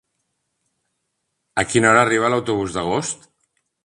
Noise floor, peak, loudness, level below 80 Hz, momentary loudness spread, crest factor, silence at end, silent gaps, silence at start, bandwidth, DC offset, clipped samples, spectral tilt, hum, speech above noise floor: -75 dBFS; 0 dBFS; -18 LUFS; -52 dBFS; 13 LU; 22 dB; 0.7 s; none; 1.55 s; 11.5 kHz; under 0.1%; under 0.1%; -4 dB/octave; none; 57 dB